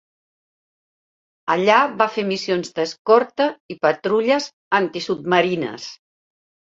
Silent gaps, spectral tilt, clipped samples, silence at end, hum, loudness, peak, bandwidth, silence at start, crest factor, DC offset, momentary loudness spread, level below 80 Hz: 2.99-3.05 s, 3.60-3.69 s, 4.53-4.71 s; -4.5 dB/octave; under 0.1%; 0.8 s; none; -19 LUFS; 0 dBFS; 7.8 kHz; 1.45 s; 20 dB; under 0.1%; 10 LU; -68 dBFS